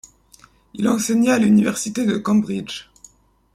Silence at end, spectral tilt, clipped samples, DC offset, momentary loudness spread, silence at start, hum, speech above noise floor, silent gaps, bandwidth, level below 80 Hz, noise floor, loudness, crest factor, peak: 0.75 s; -5 dB/octave; under 0.1%; under 0.1%; 16 LU; 0.75 s; none; 34 dB; none; 15 kHz; -56 dBFS; -52 dBFS; -19 LUFS; 14 dB; -6 dBFS